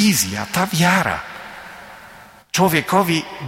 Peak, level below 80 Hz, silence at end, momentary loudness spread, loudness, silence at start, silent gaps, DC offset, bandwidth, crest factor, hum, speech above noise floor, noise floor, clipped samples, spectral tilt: -2 dBFS; -52 dBFS; 0 s; 20 LU; -18 LUFS; 0 s; none; under 0.1%; 16.5 kHz; 18 dB; none; 25 dB; -43 dBFS; under 0.1%; -4 dB/octave